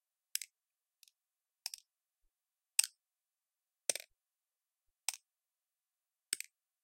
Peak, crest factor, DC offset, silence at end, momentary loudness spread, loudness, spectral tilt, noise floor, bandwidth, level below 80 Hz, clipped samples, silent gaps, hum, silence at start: -10 dBFS; 36 dB; under 0.1%; 0.45 s; 17 LU; -39 LUFS; 3 dB/octave; under -90 dBFS; 16.5 kHz; under -90 dBFS; under 0.1%; none; none; 0.35 s